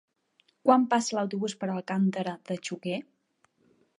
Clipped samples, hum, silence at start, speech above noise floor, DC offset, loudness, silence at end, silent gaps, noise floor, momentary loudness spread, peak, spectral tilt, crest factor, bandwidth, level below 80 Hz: under 0.1%; none; 0.65 s; 43 dB; under 0.1%; -28 LUFS; 0.95 s; none; -70 dBFS; 12 LU; -8 dBFS; -5.5 dB/octave; 22 dB; 11 kHz; -82 dBFS